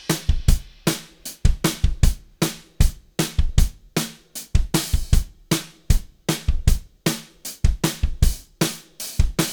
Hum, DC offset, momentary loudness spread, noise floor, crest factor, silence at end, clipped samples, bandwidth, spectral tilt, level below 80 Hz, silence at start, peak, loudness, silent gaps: none; under 0.1%; 5 LU; -38 dBFS; 18 dB; 0 s; under 0.1%; over 20 kHz; -4.5 dB/octave; -22 dBFS; 0.1 s; -2 dBFS; -24 LUFS; none